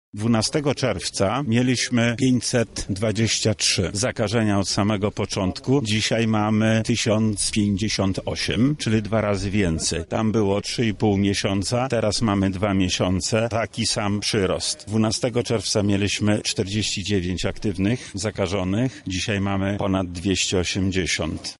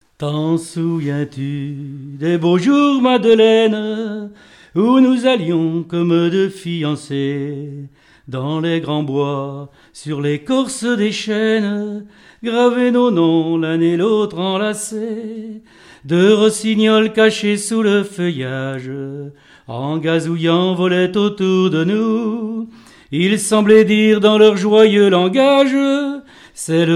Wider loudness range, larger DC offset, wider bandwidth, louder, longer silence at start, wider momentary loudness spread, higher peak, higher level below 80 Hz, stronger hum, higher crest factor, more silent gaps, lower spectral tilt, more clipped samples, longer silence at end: second, 2 LU vs 7 LU; neither; second, 11.5 kHz vs 13.5 kHz; second, -22 LUFS vs -15 LUFS; about the same, 0.15 s vs 0.2 s; second, 4 LU vs 16 LU; second, -6 dBFS vs 0 dBFS; first, -44 dBFS vs -60 dBFS; neither; about the same, 16 dB vs 14 dB; neither; about the same, -4.5 dB/octave vs -5.5 dB/octave; neither; about the same, 0.05 s vs 0 s